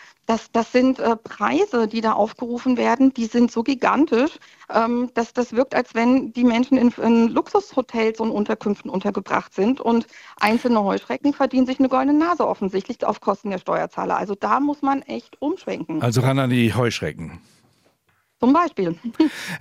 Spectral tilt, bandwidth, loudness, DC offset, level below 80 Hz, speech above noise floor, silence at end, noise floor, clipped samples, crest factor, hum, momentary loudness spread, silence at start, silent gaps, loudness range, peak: -6.5 dB/octave; 14.5 kHz; -21 LUFS; under 0.1%; -58 dBFS; 46 dB; 0 s; -66 dBFS; under 0.1%; 18 dB; none; 7 LU; 0.3 s; none; 3 LU; -2 dBFS